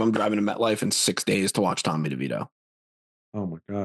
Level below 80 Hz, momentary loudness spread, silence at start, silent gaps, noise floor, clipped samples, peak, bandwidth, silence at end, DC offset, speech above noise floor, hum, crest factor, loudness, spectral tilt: -70 dBFS; 11 LU; 0 s; 2.52-3.32 s; under -90 dBFS; under 0.1%; -8 dBFS; 12.5 kHz; 0 s; under 0.1%; over 65 dB; none; 18 dB; -25 LUFS; -4 dB/octave